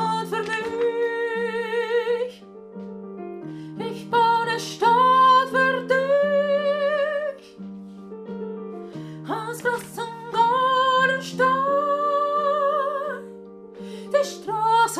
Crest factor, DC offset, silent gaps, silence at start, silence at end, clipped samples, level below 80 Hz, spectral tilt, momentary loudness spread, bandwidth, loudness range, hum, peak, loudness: 16 dB; under 0.1%; none; 0 s; 0 s; under 0.1%; -70 dBFS; -4 dB/octave; 19 LU; 15.5 kHz; 8 LU; none; -8 dBFS; -22 LUFS